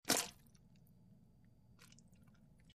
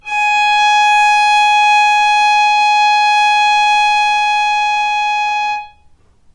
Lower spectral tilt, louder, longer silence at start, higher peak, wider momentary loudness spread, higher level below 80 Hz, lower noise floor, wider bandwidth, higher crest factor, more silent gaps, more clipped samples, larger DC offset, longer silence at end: first, -1.5 dB/octave vs 2.5 dB/octave; second, -39 LUFS vs -11 LUFS; about the same, 0.05 s vs 0.05 s; second, -18 dBFS vs -2 dBFS; first, 30 LU vs 5 LU; second, -74 dBFS vs -52 dBFS; first, -68 dBFS vs -48 dBFS; first, 15.5 kHz vs 10.5 kHz; first, 30 dB vs 10 dB; neither; neither; neither; first, 0.9 s vs 0.65 s